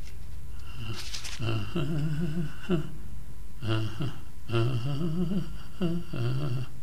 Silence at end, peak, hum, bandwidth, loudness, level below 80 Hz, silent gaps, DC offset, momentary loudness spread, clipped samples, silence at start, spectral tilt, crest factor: 0 s; -14 dBFS; none; 15.5 kHz; -32 LUFS; -44 dBFS; none; 4%; 15 LU; under 0.1%; 0 s; -6.5 dB/octave; 16 dB